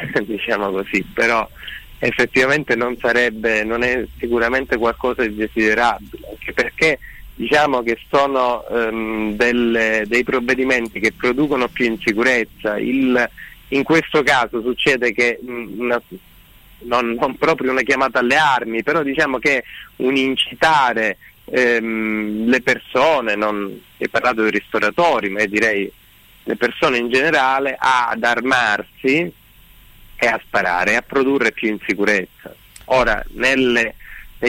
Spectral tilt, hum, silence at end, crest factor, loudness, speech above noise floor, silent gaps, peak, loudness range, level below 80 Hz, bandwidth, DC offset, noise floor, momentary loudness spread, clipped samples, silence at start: -4.5 dB/octave; none; 0 s; 12 dB; -17 LUFS; 28 dB; none; -6 dBFS; 2 LU; -44 dBFS; 16.5 kHz; under 0.1%; -46 dBFS; 7 LU; under 0.1%; 0 s